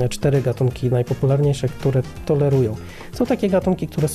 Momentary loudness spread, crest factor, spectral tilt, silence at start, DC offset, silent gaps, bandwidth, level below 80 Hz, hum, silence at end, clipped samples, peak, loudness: 6 LU; 12 dB; -7.5 dB/octave; 0 s; under 0.1%; none; 14 kHz; -40 dBFS; none; 0 s; under 0.1%; -8 dBFS; -20 LUFS